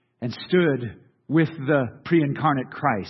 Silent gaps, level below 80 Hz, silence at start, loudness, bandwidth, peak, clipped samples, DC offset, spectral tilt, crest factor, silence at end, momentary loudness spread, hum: none; -64 dBFS; 0.2 s; -23 LUFS; 6 kHz; -6 dBFS; under 0.1%; under 0.1%; -9 dB/octave; 16 dB; 0 s; 10 LU; none